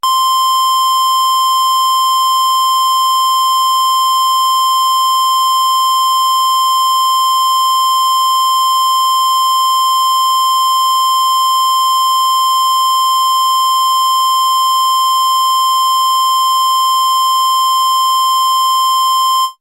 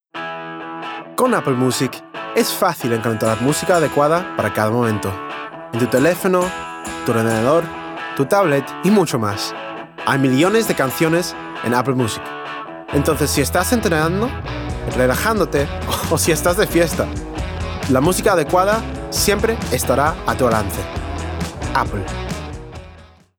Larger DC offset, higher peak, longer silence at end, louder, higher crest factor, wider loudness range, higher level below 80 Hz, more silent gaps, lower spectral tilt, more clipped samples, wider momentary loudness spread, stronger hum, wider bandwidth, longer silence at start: neither; second, -10 dBFS vs -4 dBFS; second, 0.1 s vs 0.3 s; first, -11 LUFS vs -18 LUFS; second, 2 dB vs 16 dB; about the same, 0 LU vs 2 LU; second, -72 dBFS vs -36 dBFS; neither; second, 5.5 dB/octave vs -5 dB/octave; neither; second, 0 LU vs 12 LU; neither; second, 16.5 kHz vs over 20 kHz; about the same, 0.05 s vs 0.15 s